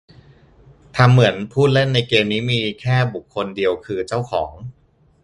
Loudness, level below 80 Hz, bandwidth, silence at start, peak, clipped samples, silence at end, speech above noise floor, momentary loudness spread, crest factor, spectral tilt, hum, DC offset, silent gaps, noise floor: -18 LUFS; -48 dBFS; 11 kHz; 0.95 s; 0 dBFS; under 0.1%; 0.5 s; 31 dB; 12 LU; 18 dB; -6.5 dB/octave; none; under 0.1%; none; -49 dBFS